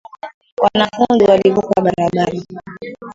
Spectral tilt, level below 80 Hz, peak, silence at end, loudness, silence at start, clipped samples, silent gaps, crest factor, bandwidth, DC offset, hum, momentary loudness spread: -6.5 dB/octave; -50 dBFS; 0 dBFS; 0 s; -14 LUFS; 0.25 s; under 0.1%; 0.34-0.41 s, 0.52-0.57 s; 16 dB; 7.8 kHz; under 0.1%; none; 21 LU